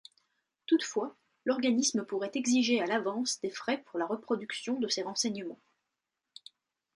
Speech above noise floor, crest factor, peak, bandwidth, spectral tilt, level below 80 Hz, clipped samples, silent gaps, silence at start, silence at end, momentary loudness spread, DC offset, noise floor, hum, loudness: 55 dB; 18 dB; -16 dBFS; 11.5 kHz; -2.5 dB/octave; -82 dBFS; under 0.1%; none; 0.7 s; 1.45 s; 13 LU; under 0.1%; -87 dBFS; none; -31 LUFS